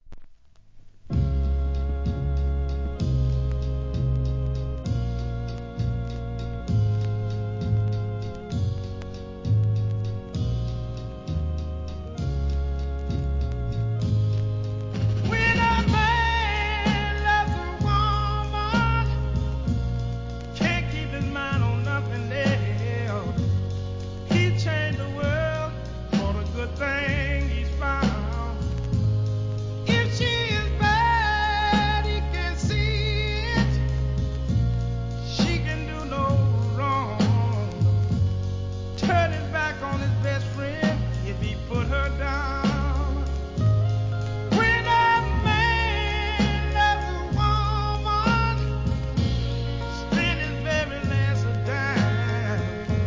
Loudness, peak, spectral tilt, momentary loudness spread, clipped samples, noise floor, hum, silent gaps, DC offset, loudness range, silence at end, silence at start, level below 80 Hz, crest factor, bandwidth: -25 LUFS; -8 dBFS; -6.5 dB/octave; 8 LU; under 0.1%; -49 dBFS; none; none; 0.2%; 6 LU; 0 s; 0.05 s; -30 dBFS; 16 dB; 7.6 kHz